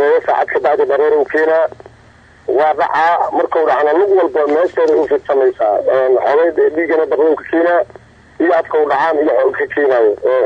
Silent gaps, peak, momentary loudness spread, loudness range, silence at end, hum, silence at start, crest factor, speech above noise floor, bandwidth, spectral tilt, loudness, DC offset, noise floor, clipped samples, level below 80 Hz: none; -4 dBFS; 3 LU; 1 LU; 0 s; none; 0 s; 10 dB; 31 dB; 7.2 kHz; -6 dB/octave; -13 LUFS; under 0.1%; -44 dBFS; under 0.1%; -56 dBFS